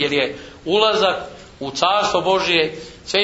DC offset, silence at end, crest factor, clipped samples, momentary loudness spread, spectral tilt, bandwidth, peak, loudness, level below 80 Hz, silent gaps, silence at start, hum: under 0.1%; 0 s; 18 dB; under 0.1%; 15 LU; -3 dB/octave; 8 kHz; -2 dBFS; -18 LUFS; -52 dBFS; none; 0 s; none